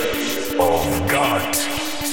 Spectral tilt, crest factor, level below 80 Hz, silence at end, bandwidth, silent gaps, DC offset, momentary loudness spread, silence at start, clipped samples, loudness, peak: -3.5 dB/octave; 14 dB; -40 dBFS; 0 s; 19 kHz; none; 2%; 4 LU; 0 s; under 0.1%; -20 LUFS; -6 dBFS